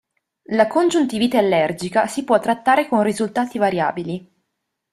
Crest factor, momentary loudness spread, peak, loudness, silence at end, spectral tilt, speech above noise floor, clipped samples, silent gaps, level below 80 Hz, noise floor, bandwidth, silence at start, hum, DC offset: 18 dB; 6 LU; -2 dBFS; -19 LUFS; 0.75 s; -5 dB/octave; 58 dB; under 0.1%; none; -60 dBFS; -77 dBFS; 14 kHz; 0.5 s; none; under 0.1%